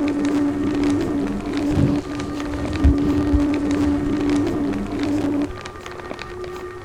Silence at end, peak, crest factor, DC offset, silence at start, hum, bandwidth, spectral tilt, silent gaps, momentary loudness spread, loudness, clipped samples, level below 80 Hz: 0 s; -4 dBFS; 16 dB; under 0.1%; 0 s; none; 11 kHz; -7 dB/octave; none; 12 LU; -21 LUFS; under 0.1%; -30 dBFS